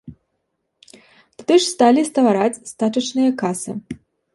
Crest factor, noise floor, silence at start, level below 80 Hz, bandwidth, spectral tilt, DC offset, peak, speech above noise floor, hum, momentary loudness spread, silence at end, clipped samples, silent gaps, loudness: 18 dB; -73 dBFS; 0.05 s; -60 dBFS; 11.5 kHz; -4.5 dB/octave; under 0.1%; -2 dBFS; 56 dB; none; 15 LU; 0.4 s; under 0.1%; none; -18 LUFS